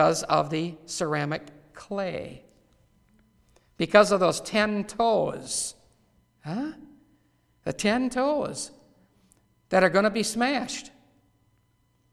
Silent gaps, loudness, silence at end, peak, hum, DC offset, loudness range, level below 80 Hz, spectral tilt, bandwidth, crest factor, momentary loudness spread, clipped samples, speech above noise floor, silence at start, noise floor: none; -26 LUFS; 1.25 s; -2 dBFS; none; under 0.1%; 6 LU; -60 dBFS; -4 dB/octave; 14 kHz; 24 dB; 15 LU; under 0.1%; 42 dB; 0 s; -67 dBFS